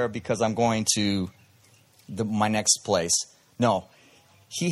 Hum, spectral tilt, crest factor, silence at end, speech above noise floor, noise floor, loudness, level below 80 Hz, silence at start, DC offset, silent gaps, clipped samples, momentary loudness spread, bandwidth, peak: none; -3.5 dB/octave; 22 dB; 0 s; 33 dB; -58 dBFS; -24 LUFS; -62 dBFS; 0 s; under 0.1%; none; under 0.1%; 13 LU; 15 kHz; -6 dBFS